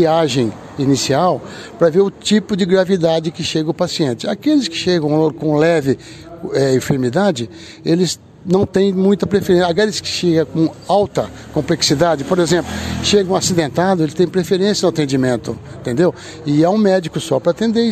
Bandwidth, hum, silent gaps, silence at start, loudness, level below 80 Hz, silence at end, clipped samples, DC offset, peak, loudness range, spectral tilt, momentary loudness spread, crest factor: 14 kHz; none; none; 0 s; -16 LUFS; -44 dBFS; 0 s; under 0.1%; under 0.1%; -2 dBFS; 1 LU; -5 dB/octave; 8 LU; 14 dB